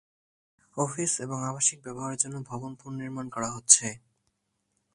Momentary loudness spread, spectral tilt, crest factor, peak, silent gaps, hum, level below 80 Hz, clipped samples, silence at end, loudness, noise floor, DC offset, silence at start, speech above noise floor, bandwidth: 19 LU; -2.5 dB/octave; 30 dB; -2 dBFS; none; none; -68 dBFS; under 0.1%; 0.95 s; -26 LUFS; -77 dBFS; under 0.1%; 0.75 s; 48 dB; 11.5 kHz